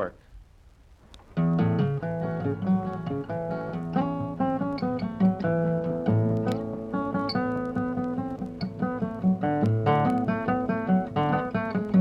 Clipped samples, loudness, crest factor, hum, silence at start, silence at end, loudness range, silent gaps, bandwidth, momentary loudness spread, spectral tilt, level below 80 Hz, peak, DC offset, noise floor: under 0.1%; -27 LUFS; 16 dB; none; 0 s; 0 s; 3 LU; none; 5.8 kHz; 8 LU; -9.5 dB/octave; -52 dBFS; -10 dBFS; under 0.1%; -54 dBFS